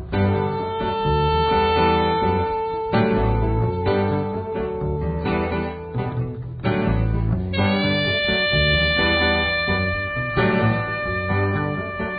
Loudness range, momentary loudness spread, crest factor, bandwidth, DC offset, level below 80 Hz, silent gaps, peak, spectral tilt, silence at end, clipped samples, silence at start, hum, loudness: 5 LU; 8 LU; 16 dB; 5 kHz; under 0.1%; -32 dBFS; none; -6 dBFS; -11 dB/octave; 0 s; under 0.1%; 0 s; none; -21 LUFS